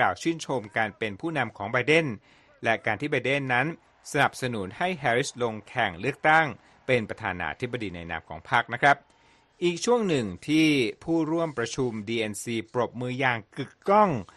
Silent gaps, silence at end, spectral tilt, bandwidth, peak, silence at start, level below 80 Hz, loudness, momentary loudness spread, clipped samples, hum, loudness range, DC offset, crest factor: none; 0.1 s; -5 dB/octave; 12 kHz; -6 dBFS; 0 s; -60 dBFS; -26 LUFS; 10 LU; under 0.1%; none; 2 LU; under 0.1%; 20 dB